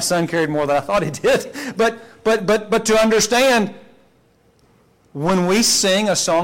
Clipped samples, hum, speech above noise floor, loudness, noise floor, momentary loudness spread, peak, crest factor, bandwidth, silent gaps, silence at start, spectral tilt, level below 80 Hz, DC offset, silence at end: under 0.1%; none; 39 dB; -17 LUFS; -56 dBFS; 7 LU; -8 dBFS; 10 dB; 17 kHz; none; 0 s; -3.5 dB/octave; -48 dBFS; under 0.1%; 0 s